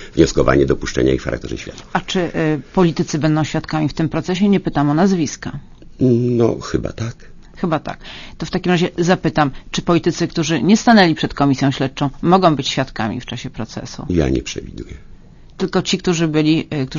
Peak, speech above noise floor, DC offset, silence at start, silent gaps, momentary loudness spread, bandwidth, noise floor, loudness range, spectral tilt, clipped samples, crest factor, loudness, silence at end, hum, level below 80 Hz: 0 dBFS; 23 dB; under 0.1%; 0 s; none; 14 LU; 7.4 kHz; -39 dBFS; 5 LU; -6 dB/octave; under 0.1%; 18 dB; -17 LUFS; 0 s; none; -36 dBFS